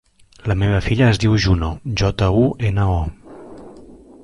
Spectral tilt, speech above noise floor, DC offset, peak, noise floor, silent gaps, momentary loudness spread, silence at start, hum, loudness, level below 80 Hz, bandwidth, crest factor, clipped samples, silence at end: -6.5 dB/octave; 25 dB; under 0.1%; -4 dBFS; -42 dBFS; none; 14 LU; 0.45 s; none; -18 LUFS; -30 dBFS; 11 kHz; 14 dB; under 0.1%; 0.3 s